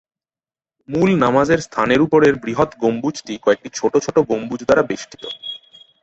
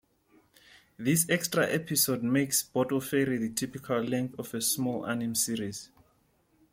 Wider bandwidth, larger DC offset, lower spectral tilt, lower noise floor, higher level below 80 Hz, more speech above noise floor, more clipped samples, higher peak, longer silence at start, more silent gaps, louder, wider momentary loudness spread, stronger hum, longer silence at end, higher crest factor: second, 8.2 kHz vs 16.5 kHz; neither; first, -5.5 dB/octave vs -3.5 dB/octave; first, under -90 dBFS vs -68 dBFS; first, -50 dBFS vs -68 dBFS; first, over 73 dB vs 39 dB; neither; first, -2 dBFS vs -12 dBFS; about the same, 0.9 s vs 1 s; neither; first, -17 LUFS vs -29 LUFS; first, 14 LU vs 8 LU; neither; second, 0.45 s vs 0.85 s; about the same, 16 dB vs 20 dB